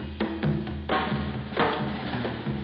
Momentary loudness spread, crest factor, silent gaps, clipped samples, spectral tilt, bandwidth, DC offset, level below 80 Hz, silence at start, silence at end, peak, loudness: 5 LU; 16 dB; none; under 0.1%; -10 dB/octave; 5.6 kHz; under 0.1%; -42 dBFS; 0 s; 0 s; -12 dBFS; -29 LUFS